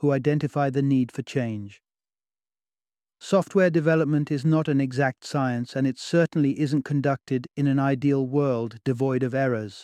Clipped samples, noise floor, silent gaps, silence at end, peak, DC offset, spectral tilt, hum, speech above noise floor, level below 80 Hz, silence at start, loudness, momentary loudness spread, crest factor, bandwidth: under 0.1%; under -90 dBFS; none; 0 s; -8 dBFS; under 0.1%; -7.5 dB/octave; none; over 67 dB; -66 dBFS; 0 s; -24 LUFS; 7 LU; 16 dB; 11 kHz